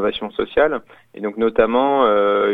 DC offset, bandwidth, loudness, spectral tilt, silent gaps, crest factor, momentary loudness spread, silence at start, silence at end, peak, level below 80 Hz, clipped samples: under 0.1%; 4 kHz; -18 LUFS; -7.5 dB/octave; none; 18 dB; 13 LU; 0 s; 0 s; 0 dBFS; -48 dBFS; under 0.1%